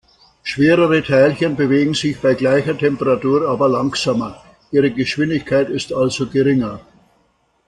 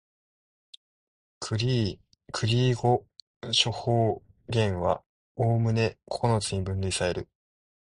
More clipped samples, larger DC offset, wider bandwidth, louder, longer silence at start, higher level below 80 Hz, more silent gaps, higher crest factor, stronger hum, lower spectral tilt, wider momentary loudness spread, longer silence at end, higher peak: neither; neither; about the same, 11 kHz vs 11 kHz; first, -16 LUFS vs -27 LUFS; second, 0.45 s vs 1.4 s; about the same, -50 dBFS vs -48 dBFS; second, none vs 3.22-3.41 s, 5.06-5.35 s; second, 14 dB vs 20 dB; neither; about the same, -6 dB/octave vs -5 dB/octave; second, 7 LU vs 13 LU; first, 0.9 s vs 0.55 s; first, -2 dBFS vs -8 dBFS